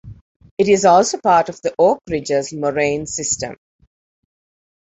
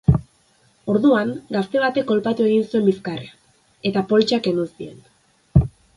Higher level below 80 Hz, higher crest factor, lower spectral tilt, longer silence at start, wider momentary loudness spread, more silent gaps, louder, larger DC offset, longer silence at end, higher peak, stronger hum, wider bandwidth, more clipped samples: second, -50 dBFS vs -38 dBFS; about the same, 16 dB vs 20 dB; second, -4 dB/octave vs -7.5 dB/octave; about the same, 0.05 s vs 0.1 s; about the same, 10 LU vs 12 LU; first, 0.21-0.40 s, 0.51-0.57 s vs none; first, -17 LUFS vs -20 LUFS; neither; first, 1.3 s vs 0.25 s; about the same, -2 dBFS vs 0 dBFS; neither; second, 8.4 kHz vs 11.5 kHz; neither